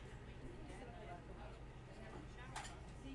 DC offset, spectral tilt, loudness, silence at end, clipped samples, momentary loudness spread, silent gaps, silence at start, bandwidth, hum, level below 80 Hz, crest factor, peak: under 0.1%; -5 dB/octave; -54 LUFS; 0 s; under 0.1%; 5 LU; none; 0 s; 11.5 kHz; none; -58 dBFS; 16 dB; -36 dBFS